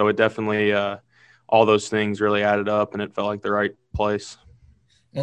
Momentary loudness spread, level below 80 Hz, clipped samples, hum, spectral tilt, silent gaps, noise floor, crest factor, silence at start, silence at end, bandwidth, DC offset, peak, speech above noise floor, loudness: 10 LU; -48 dBFS; under 0.1%; none; -5.5 dB/octave; none; -57 dBFS; 20 dB; 0 s; 0 s; 9.6 kHz; under 0.1%; -2 dBFS; 36 dB; -22 LUFS